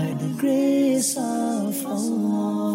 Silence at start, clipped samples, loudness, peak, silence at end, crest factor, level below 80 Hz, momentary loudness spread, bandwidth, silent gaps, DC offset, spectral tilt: 0 s; under 0.1%; -23 LUFS; -12 dBFS; 0 s; 10 dB; -72 dBFS; 6 LU; 16 kHz; none; under 0.1%; -5 dB/octave